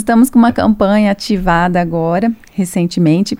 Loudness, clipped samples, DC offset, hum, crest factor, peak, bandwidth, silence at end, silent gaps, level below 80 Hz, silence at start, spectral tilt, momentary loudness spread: -13 LUFS; under 0.1%; under 0.1%; none; 12 dB; 0 dBFS; 16 kHz; 0.05 s; none; -34 dBFS; 0 s; -6.5 dB/octave; 6 LU